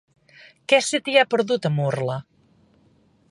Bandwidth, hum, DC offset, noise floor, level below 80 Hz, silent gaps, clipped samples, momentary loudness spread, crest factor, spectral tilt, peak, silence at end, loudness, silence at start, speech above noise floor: 11.5 kHz; none; under 0.1%; -59 dBFS; -68 dBFS; none; under 0.1%; 11 LU; 20 dB; -4.5 dB/octave; -4 dBFS; 1.1 s; -21 LUFS; 0.7 s; 38 dB